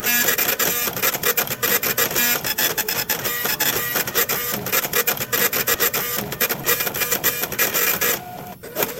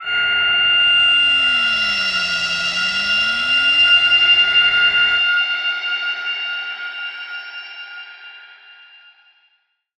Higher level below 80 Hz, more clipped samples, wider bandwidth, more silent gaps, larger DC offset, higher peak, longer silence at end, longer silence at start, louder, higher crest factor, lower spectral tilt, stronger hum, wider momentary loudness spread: about the same, -52 dBFS vs -54 dBFS; neither; first, 17 kHz vs 11.5 kHz; neither; neither; first, 0 dBFS vs -4 dBFS; second, 0 s vs 1.25 s; about the same, 0 s vs 0 s; second, -19 LUFS vs -14 LUFS; first, 20 dB vs 14 dB; about the same, -1 dB/octave vs 0 dB/octave; neither; second, 4 LU vs 18 LU